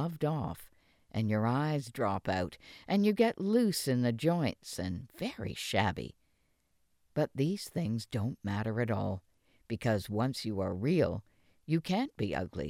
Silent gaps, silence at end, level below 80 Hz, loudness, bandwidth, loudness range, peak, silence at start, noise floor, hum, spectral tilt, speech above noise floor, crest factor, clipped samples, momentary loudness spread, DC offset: none; 0 s; -60 dBFS; -33 LUFS; 16.5 kHz; 5 LU; -12 dBFS; 0 s; -73 dBFS; none; -6.5 dB/octave; 41 dB; 20 dB; under 0.1%; 11 LU; under 0.1%